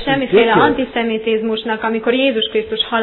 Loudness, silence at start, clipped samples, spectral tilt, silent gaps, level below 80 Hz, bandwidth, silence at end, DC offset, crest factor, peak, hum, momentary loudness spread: -15 LUFS; 0 s; under 0.1%; -8.5 dB/octave; none; -46 dBFS; 4.3 kHz; 0 s; under 0.1%; 14 dB; -2 dBFS; none; 7 LU